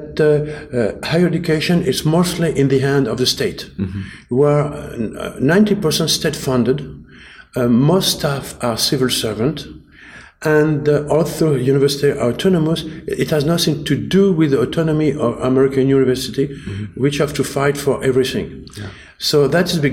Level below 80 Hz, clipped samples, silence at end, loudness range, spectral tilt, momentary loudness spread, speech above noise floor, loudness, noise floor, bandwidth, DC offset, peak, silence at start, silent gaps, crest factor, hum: -42 dBFS; under 0.1%; 0 s; 2 LU; -5.5 dB/octave; 11 LU; 25 dB; -17 LUFS; -41 dBFS; 16.5 kHz; under 0.1%; -4 dBFS; 0 s; none; 14 dB; none